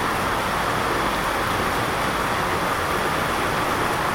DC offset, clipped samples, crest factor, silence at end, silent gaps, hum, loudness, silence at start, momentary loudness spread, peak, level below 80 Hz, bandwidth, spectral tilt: under 0.1%; under 0.1%; 12 dB; 0 s; none; none; -22 LUFS; 0 s; 1 LU; -10 dBFS; -40 dBFS; 17 kHz; -4 dB/octave